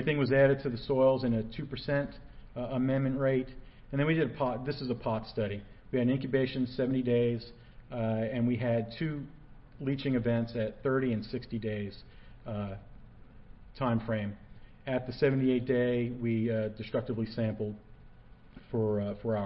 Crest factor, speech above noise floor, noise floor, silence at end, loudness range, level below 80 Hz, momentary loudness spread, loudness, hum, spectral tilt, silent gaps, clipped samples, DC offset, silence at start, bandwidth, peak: 18 dB; 23 dB; -53 dBFS; 0 s; 5 LU; -52 dBFS; 13 LU; -32 LUFS; none; -11 dB/octave; none; under 0.1%; under 0.1%; 0 s; 5.8 kHz; -12 dBFS